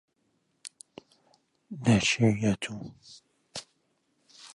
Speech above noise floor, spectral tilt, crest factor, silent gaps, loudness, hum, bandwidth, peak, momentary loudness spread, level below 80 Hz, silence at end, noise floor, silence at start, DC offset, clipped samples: 47 dB; -5 dB/octave; 20 dB; none; -26 LUFS; none; 11.5 kHz; -10 dBFS; 25 LU; -58 dBFS; 0.1 s; -74 dBFS; 0.65 s; under 0.1%; under 0.1%